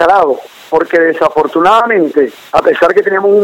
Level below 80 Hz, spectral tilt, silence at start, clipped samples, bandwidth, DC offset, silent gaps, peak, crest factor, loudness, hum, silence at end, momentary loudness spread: -48 dBFS; -5.5 dB/octave; 0 s; 0.2%; 16 kHz; under 0.1%; none; 0 dBFS; 10 dB; -10 LUFS; none; 0 s; 6 LU